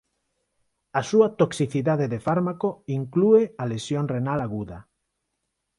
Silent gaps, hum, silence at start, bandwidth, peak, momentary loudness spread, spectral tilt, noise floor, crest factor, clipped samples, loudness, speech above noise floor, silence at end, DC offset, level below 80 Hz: none; none; 0.95 s; 11.5 kHz; -6 dBFS; 11 LU; -7 dB/octave; -79 dBFS; 18 dB; under 0.1%; -24 LUFS; 56 dB; 0.95 s; under 0.1%; -58 dBFS